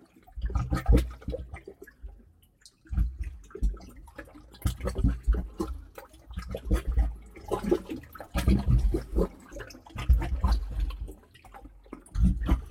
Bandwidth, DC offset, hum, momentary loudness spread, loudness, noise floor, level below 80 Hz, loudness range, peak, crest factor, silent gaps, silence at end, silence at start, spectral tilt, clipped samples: 15 kHz; under 0.1%; none; 22 LU; -31 LUFS; -59 dBFS; -30 dBFS; 7 LU; -10 dBFS; 20 dB; none; 0 s; 0.35 s; -7.5 dB/octave; under 0.1%